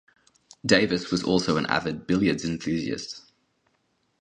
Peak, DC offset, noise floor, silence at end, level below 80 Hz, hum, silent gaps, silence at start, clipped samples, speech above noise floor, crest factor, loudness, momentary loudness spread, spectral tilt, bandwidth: -2 dBFS; under 0.1%; -71 dBFS; 1 s; -54 dBFS; none; none; 0.65 s; under 0.1%; 47 dB; 24 dB; -25 LUFS; 11 LU; -5 dB/octave; 10 kHz